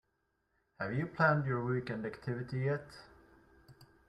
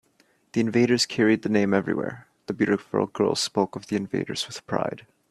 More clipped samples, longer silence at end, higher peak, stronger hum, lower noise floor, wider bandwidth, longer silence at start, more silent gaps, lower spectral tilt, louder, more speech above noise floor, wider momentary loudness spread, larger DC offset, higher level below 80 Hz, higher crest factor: neither; about the same, 0.25 s vs 0.3 s; second, -16 dBFS vs -6 dBFS; neither; first, -80 dBFS vs -64 dBFS; second, 10.5 kHz vs 13.5 kHz; first, 0.8 s vs 0.55 s; neither; first, -8.5 dB/octave vs -5 dB/octave; second, -35 LUFS vs -25 LUFS; first, 46 dB vs 40 dB; about the same, 12 LU vs 10 LU; neither; about the same, -68 dBFS vs -64 dBFS; about the same, 20 dB vs 20 dB